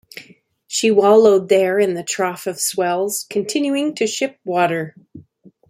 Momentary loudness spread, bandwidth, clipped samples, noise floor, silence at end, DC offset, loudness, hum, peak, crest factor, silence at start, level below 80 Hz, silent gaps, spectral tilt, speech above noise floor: 12 LU; 16 kHz; under 0.1%; -50 dBFS; 0.5 s; under 0.1%; -17 LUFS; none; -2 dBFS; 16 dB; 0.15 s; -68 dBFS; none; -3.5 dB/octave; 33 dB